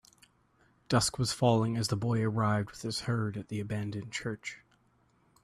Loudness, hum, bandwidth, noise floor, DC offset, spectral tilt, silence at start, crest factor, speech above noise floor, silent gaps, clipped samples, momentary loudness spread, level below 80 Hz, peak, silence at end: -31 LUFS; none; 13.5 kHz; -69 dBFS; under 0.1%; -5 dB/octave; 0.9 s; 20 dB; 38 dB; none; under 0.1%; 11 LU; -60 dBFS; -12 dBFS; 0.85 s